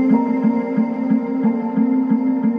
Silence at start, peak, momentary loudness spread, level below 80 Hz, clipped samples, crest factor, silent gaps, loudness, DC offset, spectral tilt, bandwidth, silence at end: 0 s; -4 dBFS; 3 LU; -68 dBFS; under 0.1%; 14 dB; none; -18 LUFS; under 0.1%; -10.5 dB/octave; 4.9 kHz; 0 s